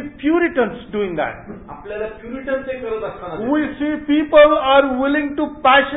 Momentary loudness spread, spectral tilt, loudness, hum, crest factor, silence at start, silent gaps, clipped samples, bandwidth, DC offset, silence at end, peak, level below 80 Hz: 17 LU; -10 dB/octave; -17 LUFS; none; 16 dB; 0 s; none; under 0.1%; 4 kHz; 0.1%; 0 s; -2 dBFS; -46 dBFS